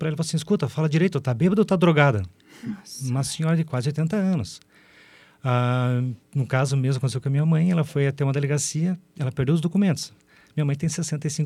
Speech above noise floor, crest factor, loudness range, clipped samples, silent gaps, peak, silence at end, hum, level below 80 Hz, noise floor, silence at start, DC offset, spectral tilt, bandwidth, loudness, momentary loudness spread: 30 dB; 20 dB; 3 LU; under 0.1%; none; -2 dBFS; 0 s; none; -58 dBFS; -53 dBFS; 0 s; under 0.1%; -6.5 dB/octave; 13 kHz; -23 LUFS; 11 LU